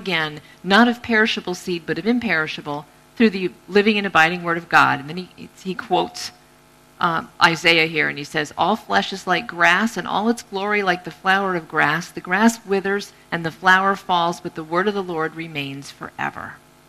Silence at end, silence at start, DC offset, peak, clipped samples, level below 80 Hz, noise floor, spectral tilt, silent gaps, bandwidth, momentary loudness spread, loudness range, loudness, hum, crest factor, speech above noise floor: 0.3 s; 0 s; under 0.1%; 0 dBFS; under 0.1%; -58 dBFS; -51 dBFS; -4.5 dB/octave; none; 14.5 kHz; 15 LU; 2 LU; -19 LUFS; none; 20 dB; 31 dB